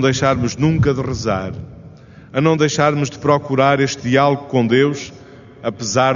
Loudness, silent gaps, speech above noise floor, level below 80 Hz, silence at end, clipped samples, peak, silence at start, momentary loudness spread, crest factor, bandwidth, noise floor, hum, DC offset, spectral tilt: -17 LUFS; none; 24 dB; -44 dBFS; 0 s; under 0.1%; 0 dBFS; 0 s; 12 LU; 16 dB; 7.4 kHz; -40 dBFS; none; under 0.1%; -5.5 dB/octave